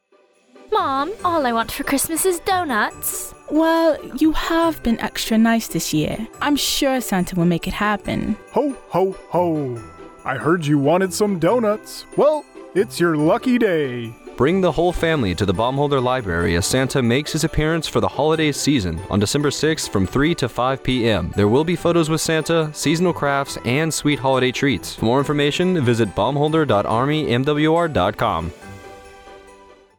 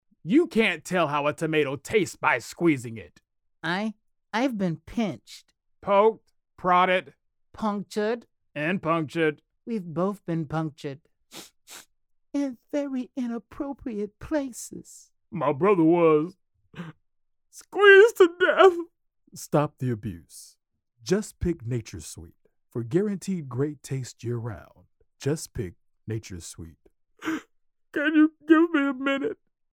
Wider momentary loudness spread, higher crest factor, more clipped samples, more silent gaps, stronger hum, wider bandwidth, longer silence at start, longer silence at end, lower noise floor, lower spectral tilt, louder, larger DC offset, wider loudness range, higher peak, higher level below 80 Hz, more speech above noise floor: second, 6 LU vs 22 LU; second, 12 dB vs 22 dB; neither; neither; neither; first, 19.5 kHz vs 16.5 kHz; first, 0.7 s vs 0.25 s; first, 0.6 s vs 0.4 s; second, -57 dBFS vs -72 dBFS; about the same, -5 dB/octave vs -5.5 dB/octave; first, -19 LUFS vs -25 LUFS; neither; second, 2 LU vs 13 LU; about the same, -6 dBFS vs -4 dBFS; first, -40 dBFS vs -56 dBFS; second, 38 dB vs 47 dB